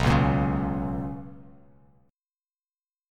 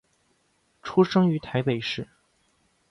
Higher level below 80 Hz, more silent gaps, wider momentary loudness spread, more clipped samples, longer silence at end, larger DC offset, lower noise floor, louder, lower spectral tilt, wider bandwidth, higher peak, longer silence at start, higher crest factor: first, -38 dBFS vs -62 dBFS; neither; about the same, 18 LU vs 17 LU; neither; first, 1.65 s vs 0.85 s; neither; first, under -90 dBFS vs -68 dBFS; about the same, -26 LUFS vs -25 LUFS; about the same, -7.5 dB/octave vs -7.5 dB/octave; first, 10.5 kHz vs 7.2 kHz; about the same, -8 dBFS vs -8 dBFS; second, 0 s vs 0.85 s; about the same, 20 dB vs 18 dB